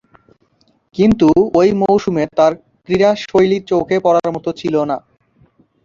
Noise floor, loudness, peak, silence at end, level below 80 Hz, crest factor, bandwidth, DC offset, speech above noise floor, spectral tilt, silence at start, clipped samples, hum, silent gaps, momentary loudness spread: -58 dBFS; -15 LUFS; -2 dBFS; 0.85 s; -44 dBFS; 14 dB; 7.4 kHz; under 0.1%; 45 dB; -7 dB/octave; 0.95 s; under 0.1%; none; none; 10 LU